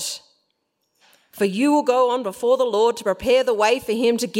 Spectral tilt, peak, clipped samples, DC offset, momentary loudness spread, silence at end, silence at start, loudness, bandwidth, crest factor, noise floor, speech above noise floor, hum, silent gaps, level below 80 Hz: -4 dB/octave; -6 dBFS; under 0.1%; under 0.1%; 6 LU; 0 s; 0 s; -20 LUFS; 16.5 kHz; 16 dB; -73 dBFS; 54 dB; none; none; -56 dBFS